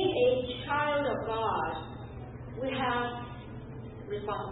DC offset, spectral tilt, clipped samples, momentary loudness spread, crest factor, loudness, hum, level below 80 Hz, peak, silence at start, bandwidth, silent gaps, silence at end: under 0.1%; -9.5 dB/octave; under 0.1%; 16 LU; 16 dB; -31 LUFS; none; -52 dBFS; -16 dBFS; 0 s; 4.1 kHz; none; 0 s